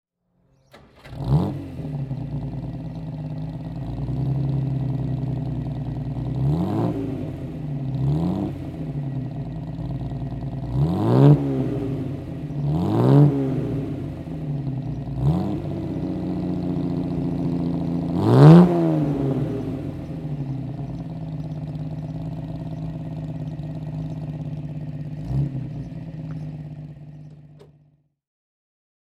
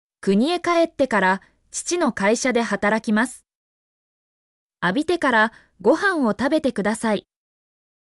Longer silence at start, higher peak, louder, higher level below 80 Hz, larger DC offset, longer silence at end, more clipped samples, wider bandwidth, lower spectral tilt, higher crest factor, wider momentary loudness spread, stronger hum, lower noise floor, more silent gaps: first, 0.75 s vs 0.25 s; first, 0 dBFS vs -8 dBFS; about the same, -23 LUFS vs -21 LUFS; first, -42 dBFS vs -58 dBFS; neither; first, 1.4 s vs 0.85 s; neither; second, 5.6 kHz vs 12 kHz; first, -10 dB/octave vs -4.5 dB/octave; first, 22 dB vs 14 dB; first, 14 LU vs 7 LU; neither; second, -65 dBFS vs under -90 dBFS; second, none vs 3.55-4.70 s